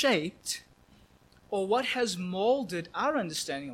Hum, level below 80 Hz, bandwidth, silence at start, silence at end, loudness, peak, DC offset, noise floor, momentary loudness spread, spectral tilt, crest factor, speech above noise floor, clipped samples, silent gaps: none; -66 dBFS; 16 kHz; 0 s; 0 s; -30 LUFS; -14 dBFS; under 0.1%; -60 dBFS; 8 LU; -3.5 dB/octave; 18 dB; 30 dB; under 0.1%; none